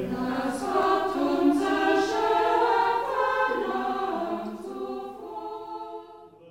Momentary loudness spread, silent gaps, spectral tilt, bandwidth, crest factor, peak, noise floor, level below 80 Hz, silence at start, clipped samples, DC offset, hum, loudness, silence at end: 14 LU; none; -4.5 dB/octave; 16 kHz; 16 dB; -10 dBFS; -48 dBFS; -60 dBFS; 0 s; under 0.1%; under 0.1%; 50 Hz at -60 dBFS; -25 LUFS; 0 s